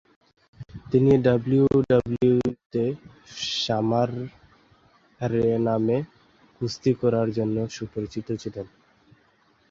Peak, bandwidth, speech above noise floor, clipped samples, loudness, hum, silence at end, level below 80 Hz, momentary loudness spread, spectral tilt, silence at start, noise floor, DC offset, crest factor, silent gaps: -8 dBFS; 7.6 kHz; 40 dB; under 0.1%; -24 LUFS; none; 1.05 s; -54 dBFS; 18 LU; -7 dB/octave; 0.6 s; -62 dBFS; under 0.1%; 18 dB; 2.66-2.70 s